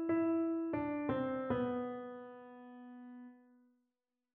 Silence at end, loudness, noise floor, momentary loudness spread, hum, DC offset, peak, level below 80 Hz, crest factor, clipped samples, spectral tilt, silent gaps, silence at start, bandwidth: 0.95 s; -37 LUFS; -89 dBFS; 19 LU; none; under 0.1%; -22 dBFS; -70 dBFS; 16 dB; under 0.1%; -6.5 dB/octave; none; 0 s; 3.7 kHz